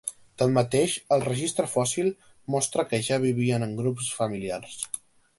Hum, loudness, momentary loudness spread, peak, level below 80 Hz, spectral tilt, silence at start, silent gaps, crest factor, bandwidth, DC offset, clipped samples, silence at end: none; -26 LUFS; 10 LU; -8 dBFS; -60 dBFS; -5 dB/octave; 0.05 s; none; 18 dB; 12 kHz; under 0.1%; under 0.1%; 0.4 s